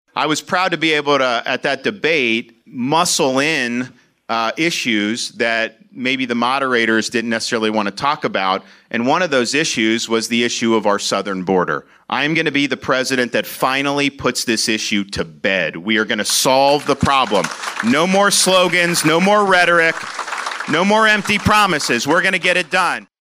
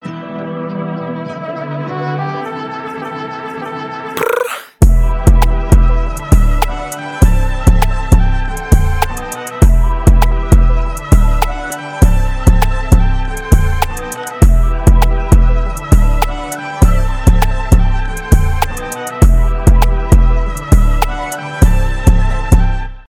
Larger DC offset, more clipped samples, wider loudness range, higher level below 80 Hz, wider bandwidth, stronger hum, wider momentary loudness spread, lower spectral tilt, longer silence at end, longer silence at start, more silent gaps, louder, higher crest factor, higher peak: neither; neither; about the same, 4 LU vs 5 LU; second, -52 dBFS vs -12 dBFS; about the same, 16 kHz vs 17 kHz; neither; second, 8 LU vs 11 LU; second, -3 dB/octave vs -6 dB/octave; about the same, 0.15 s vs 0.1 s; about the same, 0.15 s vs 0.05 s; neither; about the same, -16 LUFS vs -14 LUFS; about the same, 14 dB vs 10 dB; about the same, -2 dBFS vs 0 dBFS